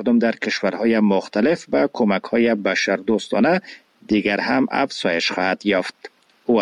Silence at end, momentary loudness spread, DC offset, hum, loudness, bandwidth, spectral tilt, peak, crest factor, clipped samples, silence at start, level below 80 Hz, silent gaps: 0 s; 4 LU; under 0.1%; none; -20 LUFS; 11 kHz; -5.5 dB/octave; -6 dBFS; 14 dB; under 0.1%; 0 s; -60 dBFS; none